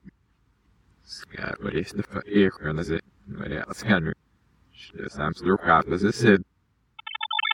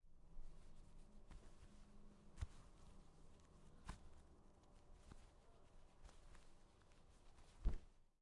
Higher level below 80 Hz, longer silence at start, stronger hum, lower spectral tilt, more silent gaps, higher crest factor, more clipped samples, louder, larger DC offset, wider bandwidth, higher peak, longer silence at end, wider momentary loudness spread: first, -50 dBFS vs -58 dBFS; about the same, 0.05 s vs 0.05 s; neither; about the same, -6 dB/octave vs -6 dB/octave; neither; about the same, 24 dB vs 26 dB; neither; first, -25 LUFS vs -61 LUFS; neither; first, 15.5 kHz vs 11 kHz; first, -4 dBFS vs -30 dBFS; about the same, 0 s vs 0.1 s; first, 21 LU vs 17 LU